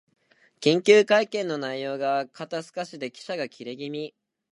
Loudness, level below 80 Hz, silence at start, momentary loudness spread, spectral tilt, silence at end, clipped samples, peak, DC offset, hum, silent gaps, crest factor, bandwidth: -25 LUFS; -80 dBFS; 0.6 s; 18 LU; -4.5 dB/octave; 0.45 s; under 0.1%; -2 dBFS; under 0.1%; none; none; 22 dB; 11 kHz